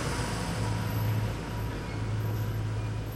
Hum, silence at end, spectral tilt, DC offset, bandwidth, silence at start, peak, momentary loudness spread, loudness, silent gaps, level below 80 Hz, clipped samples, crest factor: none; 0 s; -6 dB/octave; under 0.1%; 13.5 kHz; 0 s; -20 dBFS; 4 LU; -32 LUFS; none; -40 dBFS; under 0.1%; 12 dB